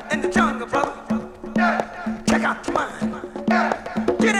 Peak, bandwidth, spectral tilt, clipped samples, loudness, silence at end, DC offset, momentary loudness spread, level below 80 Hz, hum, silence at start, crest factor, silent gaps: -4 dBFS; 12 kHz; -5 dB/octave; under 0.1%; -22 LUFS; 0 s; under 0.1%; 8 LU; -46 dBFS; none; 0 s; 18 dB; none